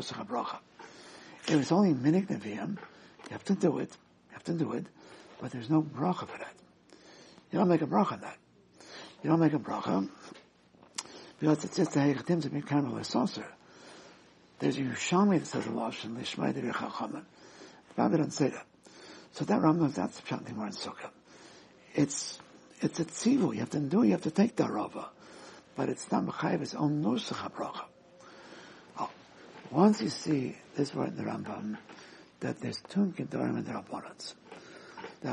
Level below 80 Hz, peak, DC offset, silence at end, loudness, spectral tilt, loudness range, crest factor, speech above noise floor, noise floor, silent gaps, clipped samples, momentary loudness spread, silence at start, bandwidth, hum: -76 dBFS; -10 dBFS; under 0.1%; 0 s; -32 LUFS; -6 dB/octave; 5 LU; 22 dB; 30 dB; -61 dBFS; none; under 0.1%; 23 LU; 0 s; 11 kHz; none